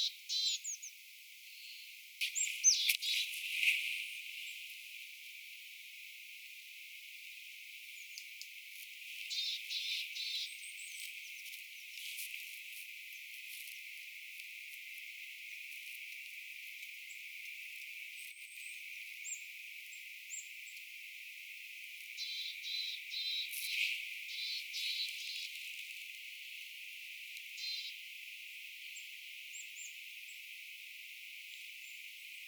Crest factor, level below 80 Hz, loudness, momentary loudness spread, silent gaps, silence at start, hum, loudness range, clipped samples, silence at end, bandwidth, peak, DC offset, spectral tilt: 30 dB; under -90 dBFS; -41 LUFS; 14 LU; none; 0 s; none; 13 LU; under 0.1%; 0 s; over 20 kHz; -14 dBFS; under 0.1%; 11 dB/octave